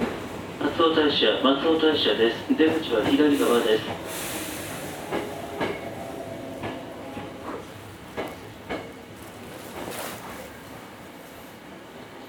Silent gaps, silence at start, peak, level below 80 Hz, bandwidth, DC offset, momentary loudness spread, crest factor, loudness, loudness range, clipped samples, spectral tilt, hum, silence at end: none; 0 s; -6 dBFS; -56 dBFS; over 20 kHz; under 0.1%; 21 LU; 20 dB; -25 LUFS; 16 LU; under 0.1%; -4 dB/octave; none; 0 s